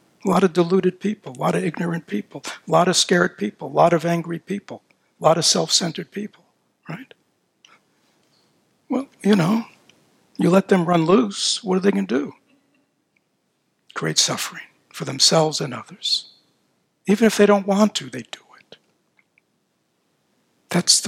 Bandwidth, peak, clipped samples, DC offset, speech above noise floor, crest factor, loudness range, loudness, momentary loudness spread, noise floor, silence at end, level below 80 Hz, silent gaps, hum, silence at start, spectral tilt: 16 kHz; 0 dBFS; under 0.1%; under 0.1%; 50 dB; 22 dB; 6 LU; -19 LUFS; 18 LU; -70 dBFS; 0 s; -70 dBFS; none; none; 0.25 s; -4 dB/octave